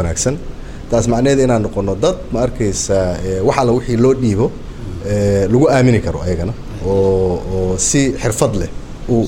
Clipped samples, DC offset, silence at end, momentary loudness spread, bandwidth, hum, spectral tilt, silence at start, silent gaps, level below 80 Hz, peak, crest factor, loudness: under 0.1%; under 0.1%; 0 s; 11 LU; 16.5 kHz; none; -5.5 dB/octave; 0 s; none; -28 dBFS; 0 dBFS; 14 dB; -15 LUFS